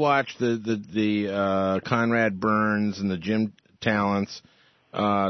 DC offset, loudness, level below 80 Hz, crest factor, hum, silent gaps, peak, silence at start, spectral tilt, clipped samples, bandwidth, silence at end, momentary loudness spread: under 0.1%; -25 LUFS; -62 dBFS; 18 dB; none; none; -6 dBFS; 0 s; -6.5 dB/octave; under 0.1%; 6.4 kHz; 0 s; 6 LU